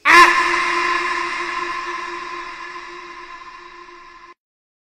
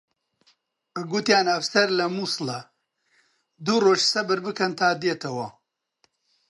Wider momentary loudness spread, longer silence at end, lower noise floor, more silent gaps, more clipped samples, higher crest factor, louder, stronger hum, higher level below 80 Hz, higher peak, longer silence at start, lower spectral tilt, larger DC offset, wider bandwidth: first, 25 LU vs 13 LU; second, 0.65 s vs 1 s; second, -42 dBFS vs -69 dBFS; neither; neither; about the same, 20 dB vs 20 dB; first, -17 LUFS vs -23 LUFS; neither; first, -50 dBFS vs -76 dBFS; first, 0 dBFS vs -4 dBFS; second, 0.05 s vs 0.95 s; second, -1 dB/octave vs -3.5 dB/octave; neither; first, 16 kHz vs 11.5 kHz